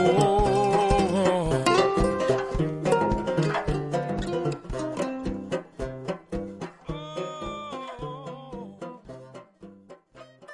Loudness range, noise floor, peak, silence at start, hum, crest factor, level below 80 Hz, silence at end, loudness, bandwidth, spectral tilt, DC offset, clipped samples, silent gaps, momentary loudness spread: 14 LU; -50 dBFS; -6 dBFS; 0 s; none; 20 dB; -40 dBFS; 0 s; -26 LUFS; 11.5 kHz; -6 dB/octave; under 0.1%; under 0.1%; none; 18 LU